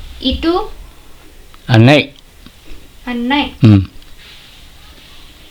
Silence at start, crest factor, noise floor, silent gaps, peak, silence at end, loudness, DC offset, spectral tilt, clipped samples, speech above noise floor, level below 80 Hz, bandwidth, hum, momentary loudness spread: 0 s; 16 dB; -39 dBFS; none; 0 dBFS; 1.3 s; -12 LUFS; under 0.1%; -7 dB/octave; under 0.1%; 29 dB; -34 dBFS; 12.5 kHz; none; 20 LU